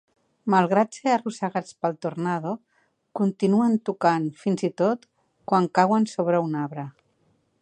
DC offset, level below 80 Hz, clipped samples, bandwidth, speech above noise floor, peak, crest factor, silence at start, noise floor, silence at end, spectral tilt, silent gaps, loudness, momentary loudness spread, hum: under 0.1%; -76 dBFS; under 0.1%; 9.8 kHz; 44 dB; -4 dBFS; 20 dB; 0.45 s; -67 dBFS; 0.7 s; -7 dB/octave; none; -24 LUFS; 12 LU; none